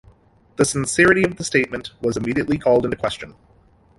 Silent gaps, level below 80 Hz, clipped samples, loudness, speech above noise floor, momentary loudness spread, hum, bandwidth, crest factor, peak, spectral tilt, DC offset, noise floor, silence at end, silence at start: none; -46 dBFS; under 0.1%; -19 LUFS; 33 dB; 11 LU; none; 11.5 kHz; 20 dB; -2 dBFS; -4.5 dB/octave; under 0.1%; -52 dBFS; 0.7 s; 0.6 s